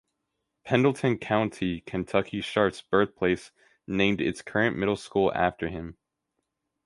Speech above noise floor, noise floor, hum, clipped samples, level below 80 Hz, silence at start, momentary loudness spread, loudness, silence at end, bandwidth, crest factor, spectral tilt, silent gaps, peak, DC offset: 55 dB; -81 dBFS; none; under 0.1%; -54 dBFS; 0.65 s; 9 LU; -27 LUFS; 0.95 s; 11.5 kHz; 22 dB; -6 dB/octave; none; -6 dBFS; under 0.1%